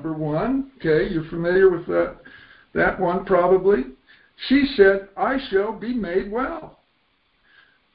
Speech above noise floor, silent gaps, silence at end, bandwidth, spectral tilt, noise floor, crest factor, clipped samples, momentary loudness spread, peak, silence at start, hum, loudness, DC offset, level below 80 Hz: 45 dB; none; 1.25 s; 5.2 kHz; -11 dB/octave; -65 dBFS; 20 dB; under 0.1%; 10 LU; -2 dBFS; 0 s; none; -21 LUFS; under 0.1%; -46 dBFS